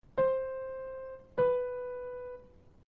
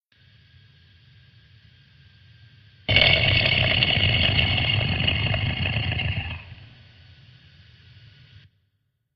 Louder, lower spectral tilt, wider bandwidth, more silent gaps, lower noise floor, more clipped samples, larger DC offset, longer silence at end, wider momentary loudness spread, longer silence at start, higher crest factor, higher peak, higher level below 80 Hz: second, -34 LUFS vs -20 LUFS; second, -5 dB/octave vs -7 dB/octave; second, 4 kHz vs 6 kHz; neither; second, -58 dBFS vs -73 dBFS; neither; neither; second, 0.4 s vs 2.5 s; first, 15 LU vs 12 LU; second, 0.05 s vs 2.9 s; second, 16 dB vs 24 dB; second, -20 dBFS vs -2 dBFS; second, -62 dBFS vs -40 dBFS